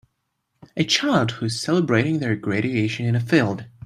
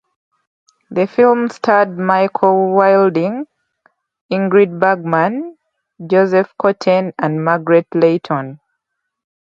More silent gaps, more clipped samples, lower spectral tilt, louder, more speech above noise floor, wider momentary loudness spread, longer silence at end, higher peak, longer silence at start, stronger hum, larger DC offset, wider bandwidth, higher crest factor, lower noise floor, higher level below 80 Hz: second, none vs 4.21-4.29 s; neither; second, -5.5 dB/octave vs -8 dB/octave; second, -21 LUFS vs -14 LUFS; second, 54 dB vs 61 dB; second, 7 LU vs 10 LU; second, 0.2 s vs 0.9 s; second, -4 dBFS vs 0 dBFS; second, 0.75 s vs 0.9 s; neither; neither; first, 13 kHz vs 7.4 kHz; about the same, 18 dB vs 16 dB; about the same, -74 dBFS vs -75 dBFS; about the same, -60 dBFS vs -64 dBFS